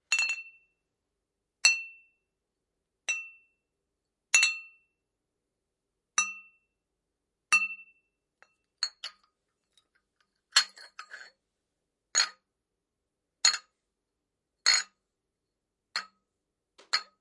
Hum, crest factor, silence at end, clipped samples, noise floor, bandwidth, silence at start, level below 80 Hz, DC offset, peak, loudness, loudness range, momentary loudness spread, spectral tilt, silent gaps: none; 28 dB; 0.15 s; under 0.1%; -86 dBFS; 11.5 kHz; 0.1 s; under -90 dBFS; under 0.1%; -6 dBFS; -27 LUFS; 4 LU; 21 LU; 5 dB/octave; none